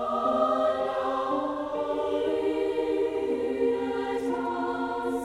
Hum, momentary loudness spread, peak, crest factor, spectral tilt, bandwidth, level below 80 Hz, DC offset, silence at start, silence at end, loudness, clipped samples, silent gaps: none; 5 LU; -12 dBFS; 16 dB; -5.5 dB/octave; 12.5 kHz; -58 dBFS; under 0.1%; 0 s; 0 s; -28 LUFS; under 0.1%; none